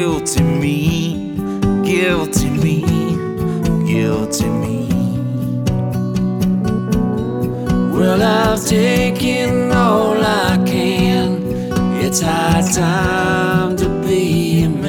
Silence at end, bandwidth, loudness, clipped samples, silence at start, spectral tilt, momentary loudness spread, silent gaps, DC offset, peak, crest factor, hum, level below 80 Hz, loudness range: 0 s; 19 kHz; -16 LUFS; under 0.1%; 0 s; -5.5 dB/octave; 6 LU; none; under 0.1%; -2 dBFS; 14 dB; none; -32 dBFS; 4 LU